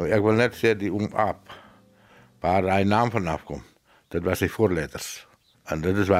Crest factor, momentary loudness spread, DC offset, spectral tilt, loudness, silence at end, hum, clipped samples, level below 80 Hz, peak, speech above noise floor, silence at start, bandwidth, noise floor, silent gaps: 18 dB; 14 LU; under 0.1%; -6 dB/octave; -24 LUFS; 0 s; none; under 0.1%; -50 dBFS; -6 dBFS; 31 dB; 0 s; 16 kHz; -55 dBFS; none